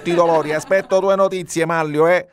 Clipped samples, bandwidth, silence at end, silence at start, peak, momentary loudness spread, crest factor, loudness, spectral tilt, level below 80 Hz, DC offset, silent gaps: under 0.1%; 15 kHz; 0.1 s; 0 s; -2 dBFS; 4 LU; 14 dB; -17 LUFS; -5 dB/octave; -58 dBFS; under 0.1%; none